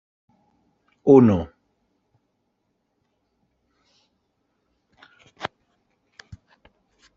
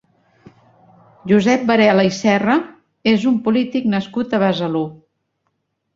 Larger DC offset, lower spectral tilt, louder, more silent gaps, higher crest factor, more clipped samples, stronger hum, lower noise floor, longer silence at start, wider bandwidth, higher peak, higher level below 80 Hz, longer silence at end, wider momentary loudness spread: neither; first, -8 dB/octave vs -6 dB/octave; about the same, -17 LUFS vs -17 LUFS; neither; first, 24 dB vs 16 dB; neither; neither; about the same, -74 dBFS vs -71 dBFS; second, 1.05 s vs 1.25 s; about the same, 7 kHz vs 7.6 kHz; about the same, -2 dBFS vs -2 dBFS; about the same, -60 dBFS vs -58 dBFS; first, 1.7 s vs 1 s; first, 21 LU vs 9 LU